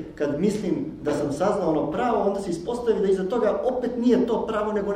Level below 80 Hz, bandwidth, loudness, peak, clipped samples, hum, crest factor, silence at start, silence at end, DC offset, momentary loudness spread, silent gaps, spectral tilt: -50 dBFS; 12 kHz; -24 LUFS; -8 dBFS; under 0.1%; none; 14 dB; 0 s; 0 s; under 0.1%; 6 LU; none; -7 dB/octave